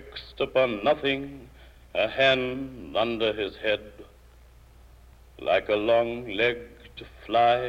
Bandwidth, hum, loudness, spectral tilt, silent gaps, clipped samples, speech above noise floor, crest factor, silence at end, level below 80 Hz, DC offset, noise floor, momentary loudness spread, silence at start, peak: 15 kHz; none; -26 LUFS; -5.5 dB/octave; none; under 0.1%; 27 dB; 18 dB; 0 s; -52 dBFS; under 0.1%; -52 dBFS; 19 LU; 0 s; -10 dBFS